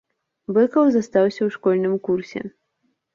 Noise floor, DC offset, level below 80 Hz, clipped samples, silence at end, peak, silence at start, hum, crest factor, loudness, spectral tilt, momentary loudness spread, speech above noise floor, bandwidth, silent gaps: -71 dBFS; under 0.1%; -66 dBFS; under 0.1%; 0.65 s; -6 dBFS; 0.5 s; none; 16 dB; -20 LUFS; -7.5 dB/octave; 16 LU; 52 dB; 7.4 kHz; none